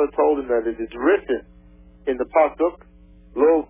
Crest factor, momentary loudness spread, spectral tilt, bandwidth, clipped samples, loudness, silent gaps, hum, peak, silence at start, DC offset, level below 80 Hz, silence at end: 16 dB; 9 LU; -9.5 dB/octave; 3.6 kHz; under 0.1%; -21 LUFS; none; none; -4 dBFS; 0 s; under 0.1%; -48 dBFS; 0.05 s